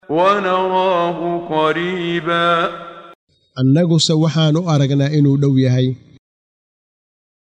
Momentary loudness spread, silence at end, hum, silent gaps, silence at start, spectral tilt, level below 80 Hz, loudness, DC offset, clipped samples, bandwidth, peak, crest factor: 8 LU; 1.55 s; none; 3.15-3.27 s; 0.1 s; -6 dB/octave; -58 dBFS; -16 LUFS; under 0.1%; under 0.1%; 9.8 kHz; -2 dBFS; 14 dB